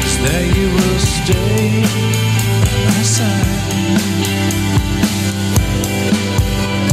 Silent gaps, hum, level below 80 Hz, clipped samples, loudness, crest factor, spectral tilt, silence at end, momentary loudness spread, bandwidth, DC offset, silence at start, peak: none; none; -24 dBFS; under 0.1%; -15 LUFS; 12 dB; -4.5 dB/octave; 0 s; 3 LU; 16 kHz; under 0.1%; 0 s; -2 dBFS